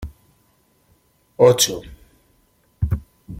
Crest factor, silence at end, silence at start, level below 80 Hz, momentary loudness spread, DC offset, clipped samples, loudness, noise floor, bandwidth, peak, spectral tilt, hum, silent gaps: 22 dB; 0 s; 0 s; -38 dBFS; 19 LU; under 0.1%; under 0.1%; -18 LUFS; -61 dBFS; 16.5 kHz; -2 dBFS; -4 dB/octave; none; none